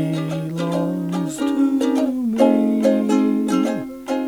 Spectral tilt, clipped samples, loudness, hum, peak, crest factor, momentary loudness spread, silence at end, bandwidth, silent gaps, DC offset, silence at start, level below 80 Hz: -7 dB/octave; under 0.1%; -20 LUFS; none; -4 dBFS; 16 dB; 8 LU; 0 s; 16.5 kHz; none; under 0.1%; 0 s; -58 dBFS